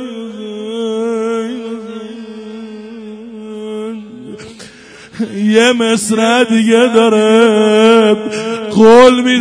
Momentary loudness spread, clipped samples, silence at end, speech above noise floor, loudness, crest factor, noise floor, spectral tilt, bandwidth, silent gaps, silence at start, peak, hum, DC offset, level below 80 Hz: 22 LU; 0.5%; 0 s; 28 dB; -10 LUFS; 12 dB; -36 dBFS; -4.5 dB/octave; 11 kHz; none; 0 s; 0 dBFS; none; under 0.1%; -52 dBFS